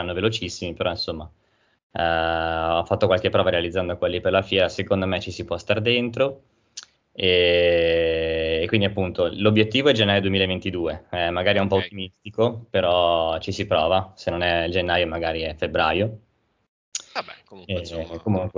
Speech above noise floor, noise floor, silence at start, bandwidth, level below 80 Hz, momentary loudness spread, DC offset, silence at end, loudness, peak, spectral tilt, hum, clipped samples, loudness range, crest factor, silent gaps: 22 dB; -44 dBFS; 0 s; 7.6 kHz; -42 dBFS; 12 LU; under 0.1%; 0 s; -22 LUFS; -4 dBFS; -5.5 dB/octave; none; under 0.1%; 4 LU; 20 dB; 1.83-1.90 s, 16.68-16.92 s